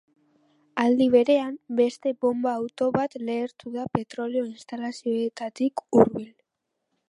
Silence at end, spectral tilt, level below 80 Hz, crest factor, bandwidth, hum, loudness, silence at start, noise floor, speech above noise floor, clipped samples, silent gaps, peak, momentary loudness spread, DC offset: 0.8 s; -6.5 dB/octave; -64 dBFS; 24 dB; 11 kHz; none; -25 LUFS; 0.75 s; -81 dBFS; 57 dB; under 0.1%; none; -2 dBFS; 14 LU; under 0.1%